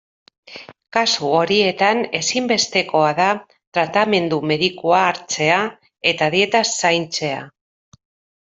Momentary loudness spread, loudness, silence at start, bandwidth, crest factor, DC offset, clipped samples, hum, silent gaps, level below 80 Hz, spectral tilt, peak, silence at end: 9 LU; -18 LUFS; 0.5 s; 8.2 kHz; 18 dB; under 0.1%; under 0.1%; none; 3.67-3.72 s; -62 dBFS; -3 dB/octave; -2 dBFS; 0.9 s